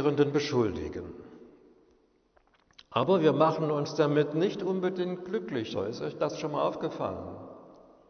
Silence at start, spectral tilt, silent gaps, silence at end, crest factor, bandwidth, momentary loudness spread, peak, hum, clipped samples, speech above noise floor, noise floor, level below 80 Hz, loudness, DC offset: 0 s; -6.5 dB/octave; none; 0.35 s; 20 dB; 6.6 kHz; 16 LU; -10 dBFS; none; under 0.1%; 38 dB; -67 dBFS; -62 dBFS; -29 LUFS; under 0.1%